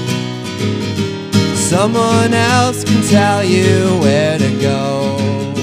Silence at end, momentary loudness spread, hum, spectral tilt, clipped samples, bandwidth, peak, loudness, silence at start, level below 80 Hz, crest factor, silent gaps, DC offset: 0 s; 7 LU; none; -5 dB/octave; under 0.1%; 16 kHz; 0 dBFS; -14 LUFS; 0 s; -50 dBFS; 14 dB; none; under 0.1%